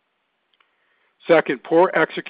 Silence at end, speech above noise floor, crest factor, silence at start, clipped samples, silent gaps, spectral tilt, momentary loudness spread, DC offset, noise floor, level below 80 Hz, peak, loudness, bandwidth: 0.1 s; 54 dB; 20 dB; 1.25 s; under 0.1%; none; -10 dB/octave; 5 LU; under 0.1%; -71 dBFS; -76 dBFS; 0 dBFS; -18 LUFS; 4.9 kHz